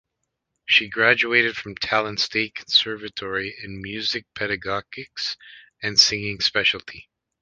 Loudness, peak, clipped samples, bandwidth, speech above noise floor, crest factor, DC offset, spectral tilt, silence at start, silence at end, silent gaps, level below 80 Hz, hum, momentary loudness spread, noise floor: -21 LUFS; -2 dBFS; under 0.1%; 10.5 kHz; 55 dB; 24 dB; under 0.1%; -2 dB/octave; 0.7 s; 0.4 s; none; -56 dBFS; none; 15 LU; -79 dBFS